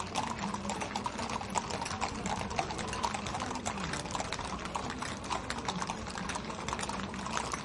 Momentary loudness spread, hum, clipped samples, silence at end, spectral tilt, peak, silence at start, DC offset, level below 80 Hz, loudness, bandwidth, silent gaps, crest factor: 3 LU; none; under 0.1%; 0 s; -3.5 dB/octave; -12 dBFS; 0 s; under 0.1%; -52 dBFS; -36 LUFS; 11.5 kHz; none; 24 dB